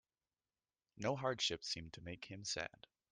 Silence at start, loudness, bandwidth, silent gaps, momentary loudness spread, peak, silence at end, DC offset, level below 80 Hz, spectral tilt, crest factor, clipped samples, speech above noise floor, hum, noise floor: 0.95 s; -42 LUFS; 11 kHz; none; 12 LU; -24 dBFS; 0.45 s; under 0.1%; -72 dBFS; -3 dB/octave; 22 dB; under 0.1%; over 47 dB; none; under -90 dBFS